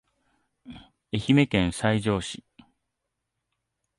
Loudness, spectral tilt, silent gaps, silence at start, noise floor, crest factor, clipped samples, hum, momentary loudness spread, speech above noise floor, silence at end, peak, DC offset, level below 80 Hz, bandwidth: -24 LUFS; -6 dB/octave; none; 0.65 s; -82 dBFS; 20 dB; under 0.1%; none; 14 LU; 58 dB; 1.6 s; -8 dBFS; under 0.1%; -50 dBFS; 11.5 kHz